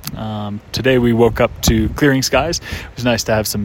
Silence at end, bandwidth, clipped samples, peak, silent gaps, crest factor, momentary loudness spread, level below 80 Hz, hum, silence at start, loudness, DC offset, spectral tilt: 0 s; 16.5 kHz; under 0.1%; 0 dBFS; none; 16 dB; 11 LU; -30 dBFS; none; 0.05 s; -16 LUFS; under 0.1%; -4.5 dB/octave